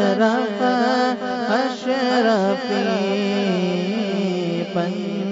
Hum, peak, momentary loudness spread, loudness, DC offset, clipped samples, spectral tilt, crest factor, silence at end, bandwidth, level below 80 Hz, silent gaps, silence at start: none; -6 dBFS; 6 LU; -20 LUFS; under 0.1%; under 0.1%; -6 dB/octave; 14 dB; 0 s; 7.8 kHz; -68 dBFS; none; 0 s